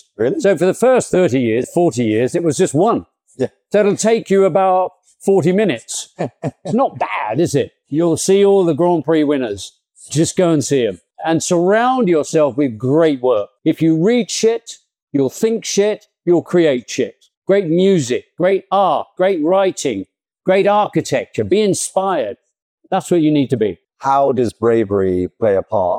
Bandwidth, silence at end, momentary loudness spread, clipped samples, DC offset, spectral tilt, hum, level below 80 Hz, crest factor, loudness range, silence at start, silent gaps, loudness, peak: 15 kHz; 0 s; 10 LU; under 0.1%; under 0.1%; -5.5 dB/octave; none; -58 dBFS; 12 dB; 2 LU; 0.2 s; 15.02-15.07 s, 17.37-17.42 s, 22.62-22.78 s; -16 LUFS; -4 dBFS